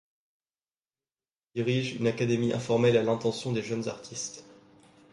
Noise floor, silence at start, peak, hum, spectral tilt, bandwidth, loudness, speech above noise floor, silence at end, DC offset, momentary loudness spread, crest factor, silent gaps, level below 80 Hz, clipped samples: under -90 dBFS; 1.55 s; -12 dBFS; none; -5.5 dB/octave; 11.5 kHz; -29 LUFS; over 62 dB; 0.6 s; under 0.1%; 13 LU; 18 dB; none; -66 dBFS; under 0.1%